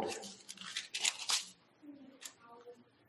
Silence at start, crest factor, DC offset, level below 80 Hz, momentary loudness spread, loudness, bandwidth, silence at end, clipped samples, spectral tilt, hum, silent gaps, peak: 0 s; 30 dB; under 0.1%; -84 dBFS; 23 LU; -37 LUFS; 16 kHz; 0.25 s; under 0.1%; 0.5 dB/octave; none; none; -12 dBFS